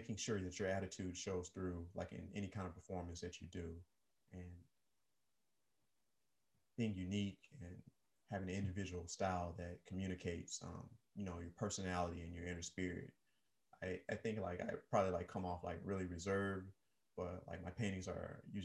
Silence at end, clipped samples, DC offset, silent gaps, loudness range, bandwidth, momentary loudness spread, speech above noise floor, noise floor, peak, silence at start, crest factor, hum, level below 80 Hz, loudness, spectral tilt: 0 s; under 0.1%; under 0.1%; none; 9 LU; 11.5 kHz; 14 LU; 44 dB; -90 dBFS; -24 dBFS; 0 s; 22 dB; none; -60 dBFS; -46 LUFS; -5.5 dB/octave